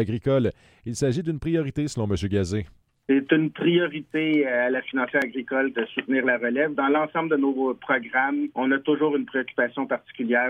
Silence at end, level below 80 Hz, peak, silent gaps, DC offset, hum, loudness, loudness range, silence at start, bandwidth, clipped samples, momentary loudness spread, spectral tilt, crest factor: 0 s; -52 dBFS; -6 dBFS; none; under 0.1%; none; -24 LUFS; 2 LU; 0 s; 11.5 kHz; under 0.1%; 6 LU; -6 dB/octave; 18 dB